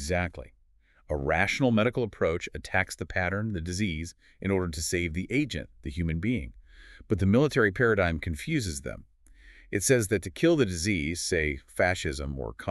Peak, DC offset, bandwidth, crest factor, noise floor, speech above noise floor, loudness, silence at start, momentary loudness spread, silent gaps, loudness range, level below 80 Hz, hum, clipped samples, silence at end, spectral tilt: -8 dBFS; under 0.1%; 13.5 kHz; 20 dB; -62 dBFS; 35 dB; -28 LUFS; 0 s; 12 LU; none; 3 LU; -44 dBFS; none; under 0.1%; 0 s; -5 dB/octave